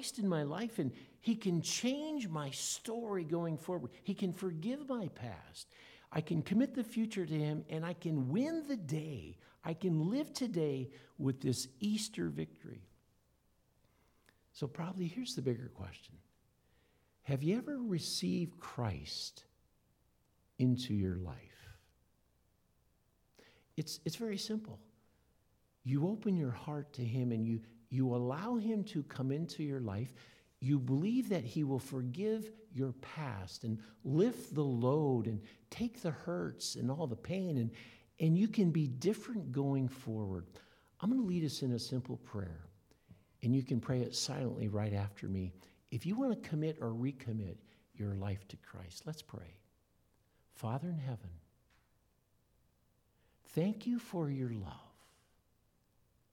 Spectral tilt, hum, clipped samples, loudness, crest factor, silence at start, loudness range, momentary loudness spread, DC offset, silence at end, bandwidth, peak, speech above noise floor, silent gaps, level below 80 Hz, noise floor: -6 dB/octave; none; under 0.1%; -38 LUFS; 20 dB; 0 s; 9 LU; 14 LU; under 0.1%; 1.45 s; 16.5 kHz; -20 dBFS; 38 dB; none; -70 dBFS; -75 dBFS